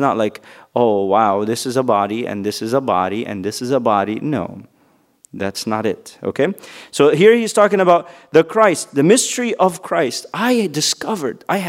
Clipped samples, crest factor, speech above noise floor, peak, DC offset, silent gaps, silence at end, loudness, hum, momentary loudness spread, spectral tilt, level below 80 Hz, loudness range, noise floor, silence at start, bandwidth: under 0.1%; 16 dB; 40 dB; 0 dBFS; under 0.1%; none; 0 s; -17 LUFS; none; 11 LU; -4.5 dB/octave; -64 dBFS; 7 LU; -57 dBFS; 0 s; 16 kHz